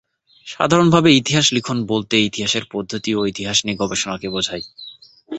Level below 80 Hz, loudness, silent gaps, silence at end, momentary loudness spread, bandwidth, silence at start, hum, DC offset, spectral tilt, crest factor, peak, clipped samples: -52 dBFS; -17 LUFS; none; 0 s; 15 LU; 8.2 kHz; 0.45 s; none; under 0.1%; -4 dB/octave; 18 dB; 0 dBFS; under 0.1%